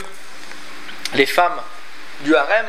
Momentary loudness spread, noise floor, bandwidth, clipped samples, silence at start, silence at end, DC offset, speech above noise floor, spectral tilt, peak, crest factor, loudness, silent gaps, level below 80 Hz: 21 LU; -38 dBFS; 15.5 kHz; under 0.1%; 0 s; 0 s; 5%; 21 dB; -3 dB/octave; 0 dBFS; 20 dB; -18 LUFS; none; -72 dBFS